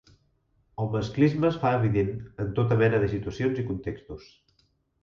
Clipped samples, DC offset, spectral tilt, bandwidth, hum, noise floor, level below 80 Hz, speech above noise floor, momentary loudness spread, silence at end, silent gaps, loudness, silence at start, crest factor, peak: under 0.1%; under 0.1%; -8.5 dB/octave; 7 kHz; none; -69 dBFS; -50 dBFS; 43 dB; 15 LU; 0.8 s; none; -26 LUFS; 0.8 s; 18 dB; -8 dBFS